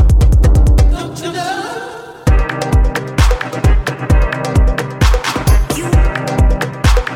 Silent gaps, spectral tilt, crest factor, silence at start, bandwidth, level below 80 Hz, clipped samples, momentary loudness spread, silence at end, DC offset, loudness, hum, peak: none; -6 dB/octave; 12 dB; 0 s; 15 kHz; -14 dBFS; under 0.1%; 10 LU; 0 s; under 0.1%; -14 LUFS; none; 0 dBFS